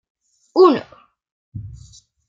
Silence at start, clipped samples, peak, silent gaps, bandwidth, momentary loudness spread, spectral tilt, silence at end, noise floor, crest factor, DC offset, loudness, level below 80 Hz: 0.55 s; under 0.1%; -2 dBFS; 1.31-1.52 s; 7.4 kHz; 24 LU; -7 dB/octave; 0.6 s; -47 dBFS; 18 dB; under 0.1%; -16 LUFS; -52 dBFS